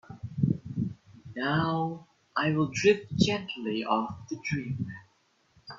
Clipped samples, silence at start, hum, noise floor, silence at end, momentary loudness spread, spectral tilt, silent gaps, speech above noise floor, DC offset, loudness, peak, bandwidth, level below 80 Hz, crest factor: under 0.1%; 0.1 s; none; -68 dBFS; 0 s; 14 LU; -6 dB/octave; none; 40 dB; under 0.1%; -30 LUFS; -8 dBFS; 7.6 kHz; -60 dBFS; 22 dB